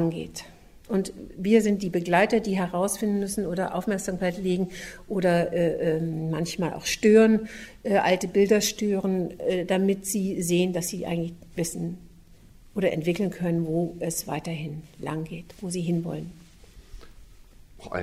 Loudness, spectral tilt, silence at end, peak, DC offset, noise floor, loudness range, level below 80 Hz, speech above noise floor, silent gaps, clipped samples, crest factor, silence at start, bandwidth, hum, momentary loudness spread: -26 LUFS; -5.5 dB/octave; 0 s; -6 dBFS; under 0.1%; -51 dBFS; 8 LU; -52 dBFS; 26 dB; none; under 0.1%; 20 dB; 0 s; 16 kHz; none; 14 LU